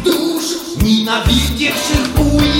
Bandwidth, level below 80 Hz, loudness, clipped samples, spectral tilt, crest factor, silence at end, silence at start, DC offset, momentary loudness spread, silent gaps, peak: 17 kHz; -22 dBFS; -14 LUFS; under 0.1%; -4.5 dB/octave; 14 dB; 0 s; 0 s; under 0.1%; 4 LU; none; 0 dBFS